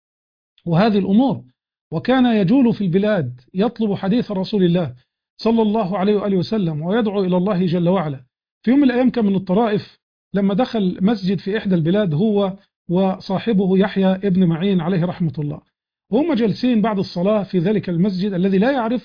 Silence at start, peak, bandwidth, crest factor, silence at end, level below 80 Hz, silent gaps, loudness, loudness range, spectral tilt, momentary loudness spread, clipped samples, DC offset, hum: 0.65 s; -4 dBFS; 5.2 kHz; 14 dB; 0.05 s; -54 dBFS; 1.81-1.91 s, 5.30-5.37 s, 8.51-8.61 s, 10.03-10.31 s, 12.76-12.85 s; -18 LUFS; 2 LU; -9.5 dB/octave; 7 LU; under 0.1%; under 0.1%; none